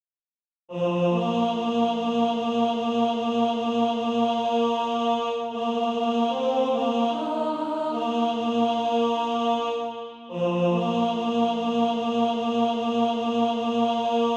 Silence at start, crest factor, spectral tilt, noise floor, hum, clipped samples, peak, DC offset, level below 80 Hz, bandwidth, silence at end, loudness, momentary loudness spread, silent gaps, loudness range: 0.7 s; 12 dB; -6.5 dB/octave; under -90 dBFS; none; under 0.1%; -12 dBFS; under 0.1%; -68 dBFS; 8 kHz; 0 s; -25 LUFS; 3 LU; none; 1 LU